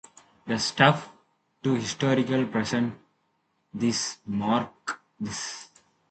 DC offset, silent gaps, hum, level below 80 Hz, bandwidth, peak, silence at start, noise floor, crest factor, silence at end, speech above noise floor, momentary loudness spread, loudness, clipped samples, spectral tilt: under 0.1%; none; none; -64 dBFS; 9 kHz; -4 dBFS; 0.45 s; -73 dBFS; 24 dB; 0.45 s; 47 dB; 15 LU; -27 LUFS; under 0.1%; -4.5 dB/octave